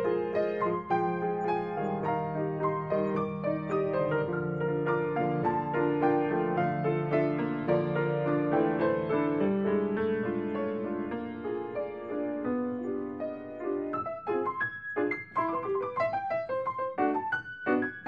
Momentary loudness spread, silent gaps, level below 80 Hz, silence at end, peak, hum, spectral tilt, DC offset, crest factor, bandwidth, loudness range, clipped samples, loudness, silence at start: 7 LU; none; -68 dBFS; 0 s; -12 dBFS; none; -9.5 dB/octave; under 0.1%; 16 dB; 7 kHz; 5 LU; under 0.1%; -30 LUFS; 0 s